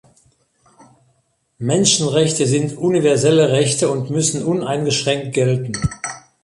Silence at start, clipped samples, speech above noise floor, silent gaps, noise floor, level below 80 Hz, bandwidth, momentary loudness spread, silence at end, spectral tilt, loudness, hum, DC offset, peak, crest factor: 1.6 s; under 0.1%; 47 dB; none; -64 dBFS; -44 dBFS; 11.5 kHz; 9 LU; 0.25 s; -4.5 dB/octave; -17 LUFS; none; under 0.1%; -2 dBFS; 16 dB